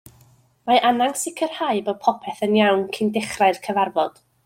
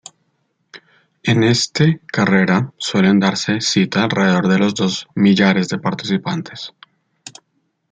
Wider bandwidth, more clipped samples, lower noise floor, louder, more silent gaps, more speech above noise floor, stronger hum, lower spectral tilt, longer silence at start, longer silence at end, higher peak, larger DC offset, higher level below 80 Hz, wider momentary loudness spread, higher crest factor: first, 16.5 kHz vs 9.2 kHz; neither; second, -55 dBFS vs -67 dBFS; second, -21 LUFS vs -16 LUFS; neither; second, 35 dB vs 52 dB; neither; about the same, -4 dB/octave vs -5 dB/octave; about the same, 0.65 s vs 0.75 s; second, 0.35 s vs 0.6 s; about the same, -4 dBFS vs -2 dBFS; neither; second, -64 dBFS vs -56 dBFS; about the same, 7 LU vs 9 LU; about the same, 18 dB vs 16 dB